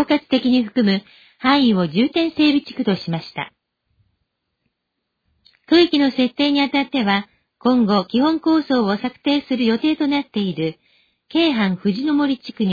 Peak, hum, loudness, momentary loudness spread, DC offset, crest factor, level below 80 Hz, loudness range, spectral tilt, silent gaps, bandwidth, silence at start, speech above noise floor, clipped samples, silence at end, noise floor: -4 dBFS; none; -18 LUFS; 8 LU; under 0.1%; 16 dB; -58 dBFS; 5 LU; -7 dB/octave; none; 5 kHz; 0 s; 59 dB; under 0.1%; 0 s; -77 dBFS